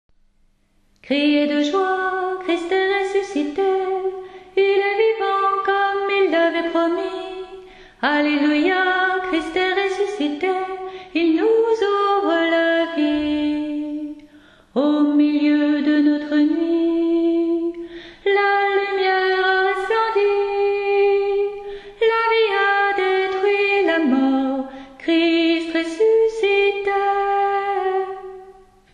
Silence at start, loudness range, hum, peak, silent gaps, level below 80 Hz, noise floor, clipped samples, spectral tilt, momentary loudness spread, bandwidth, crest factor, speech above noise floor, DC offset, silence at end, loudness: 1.05 s; 2 LU; none; -4 dBFS; none; -56 dBFS; -59 dBFS; under 0.1%; -4 dB/octave; 9 LU; 9.6 kHz; 14 dB; 41 dB; under 0.1%; 0.4 s; -19 LUFS